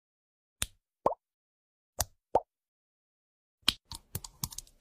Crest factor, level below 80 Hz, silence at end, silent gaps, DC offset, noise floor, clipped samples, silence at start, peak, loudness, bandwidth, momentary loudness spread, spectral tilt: 34 dB; -56 dBFS; 0.2 s; 1.34-1.93 s, 2.68-3.58 s; under 0.1%; under -90 dBFS; under 0.1%; 0.6 s; -6 dBFS; -35 LUFS; 15.5 kHz; 12 LU; -2 dB/octave